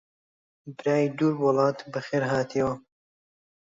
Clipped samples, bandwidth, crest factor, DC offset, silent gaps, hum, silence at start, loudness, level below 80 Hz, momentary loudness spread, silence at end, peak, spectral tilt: under 0.1%; 7.8 kHz; 18 dB; under 0.1%; none; none; 0.65 s; -26 LUFS; -64 dBFS; 11 LU; 0.85 s; -10 dBFS; -7 dB/octave